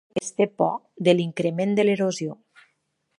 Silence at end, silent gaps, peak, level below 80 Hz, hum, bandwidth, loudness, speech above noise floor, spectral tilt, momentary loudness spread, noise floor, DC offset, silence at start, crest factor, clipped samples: 0.85 s; none; -4 dBFS; -72 dBFS; none; 11.5 kHz; -23 LUFS; 50 dB; -5.5 dB/octave; 8 LU; -73 dBFS; under 0.1%; 0.15 s; 20 dB; under 0.1%